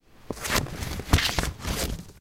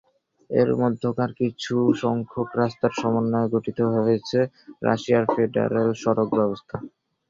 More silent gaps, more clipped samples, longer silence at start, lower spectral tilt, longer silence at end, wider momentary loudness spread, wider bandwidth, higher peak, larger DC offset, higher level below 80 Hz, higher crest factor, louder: neither; neither; second, 0.2 s vs 0.5 s; second, -3.5 dB/octave vs -7 dB/octave; second, 0 s vs 0.4 s; first, 11 LU vs 6 LU; first, 17 kHz vs 7.6 kHz; about the same, -4 dBFS vs -4 dBFS; first, 0.2% vs under 0.1%; first, -34 dBFS vs -60 dBFS; first, 24 dB vs 18 dB; second, -27 LUFS vs -23 LUFS